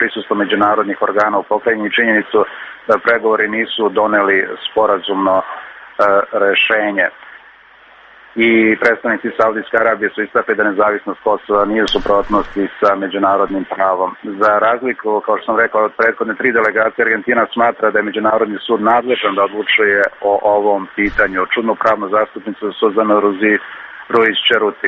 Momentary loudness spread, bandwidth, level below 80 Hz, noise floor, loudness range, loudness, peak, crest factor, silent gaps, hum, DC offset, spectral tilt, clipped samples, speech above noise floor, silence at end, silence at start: 6 LU; 8 kHz; -46 dBFS; -44 dBFS; 1 LU; -14 LUFS; 0 dBFS; 14 dB; none; none; under 0.1%; -5.5 dB/octave; under 0.1%; 29 dB; 0 s; 0 s